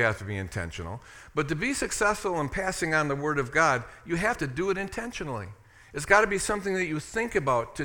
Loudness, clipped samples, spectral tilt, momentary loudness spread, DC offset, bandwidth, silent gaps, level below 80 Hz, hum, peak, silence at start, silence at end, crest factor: -27 LUFS; under 0.1%; -4.5 dB/octave; 13 LU; under 0.1%; 18 kHz; none; -48 dBFS; none; -4 dBFS; 0 s; 0 s; 24 dB